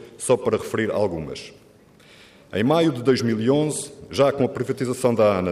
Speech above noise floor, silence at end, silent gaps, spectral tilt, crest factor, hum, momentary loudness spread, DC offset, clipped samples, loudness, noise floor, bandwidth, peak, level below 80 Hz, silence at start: 30 dB; 0 s; none; -5.5 dB/octave; 16 dB; none; 11 LU; under 0.1%; under 0.1%; -22 LUFS; -51 dBFS; 15.5 kHz; -6 dBFS; -58 dBFS; 0 s